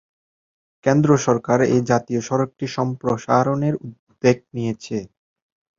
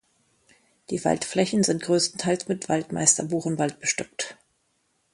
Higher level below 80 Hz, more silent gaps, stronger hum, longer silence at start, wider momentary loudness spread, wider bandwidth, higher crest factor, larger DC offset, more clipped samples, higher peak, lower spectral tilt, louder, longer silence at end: first, -56 dBFS vs -64 dBFS; first, 3.99-4.07 s vs none; neither; about the same, 0.85 s vs 0.9 s; about the same, 11 LU vs 10 LU; second, 7.6 kHz vs 11.5 kHz; about the same, 20 dB vs 24 dB; neither; neither; about the same, -2 dBFS vs -2 dBFS; first, -6.5 dB/octave vs -3.5 dB/octave; first, -20 LUFS vs -24 LUFS; about the same, 0.7 s vs 0.8 s